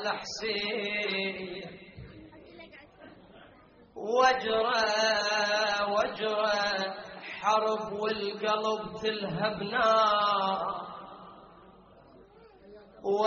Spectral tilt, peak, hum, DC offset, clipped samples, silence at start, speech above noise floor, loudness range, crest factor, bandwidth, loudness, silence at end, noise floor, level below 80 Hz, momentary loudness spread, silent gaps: -1 dB/octave; -12 dBFS; none; under 0.1%; under 0.1%; 0 s; 28 dB; 8 LU; 20 dB; 7 kHz; -28 LUFS; 0 s; -57 dBFS; -64 dBFS; 21 LU; none